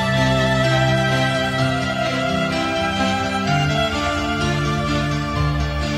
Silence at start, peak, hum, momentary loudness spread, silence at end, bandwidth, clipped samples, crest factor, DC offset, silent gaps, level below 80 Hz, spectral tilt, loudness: 0 s; -6 dBFS; none; 4 LU; 0 s; 15 kHz; under 0.1%; 14 dB; under 0.1%; none; -32 dBFS; -5.5 dB/octave; -19 LUFS